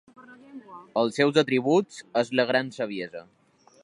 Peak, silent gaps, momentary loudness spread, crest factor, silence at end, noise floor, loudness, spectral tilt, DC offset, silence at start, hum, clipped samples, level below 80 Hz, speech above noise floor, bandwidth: -6 dBFS; none; 22 LU; 22 dB; 0.6 s; -46 dBFS; -25 LUFS; -5.5 dB/octave; under 0.1%; 0.2 s; none; under 0.1%; -76 dBFS; 21 dB; 11.5 kHz